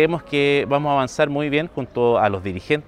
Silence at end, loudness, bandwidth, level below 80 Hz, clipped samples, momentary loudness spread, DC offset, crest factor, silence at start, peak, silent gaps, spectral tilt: 0.05 s; -20 LUFS; 10.5 kHz; -50 dBFS; under 0.1%; 5 LU; under 0.1%; 16 dB; 0 s; -4 dBFS; none; -6 dB/octave